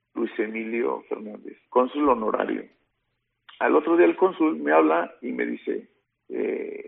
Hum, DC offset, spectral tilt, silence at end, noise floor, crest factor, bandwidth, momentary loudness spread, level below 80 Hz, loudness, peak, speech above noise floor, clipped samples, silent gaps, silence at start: none; under 0.1%; -4 dB/octave; 0 s; -77 dBFS; 20 dB; 3.9 kHz; 14 LU; -66 dBFS; -24 LUFS; -6 dBFS; 53 dB; under 0.1%; none; 0.15 s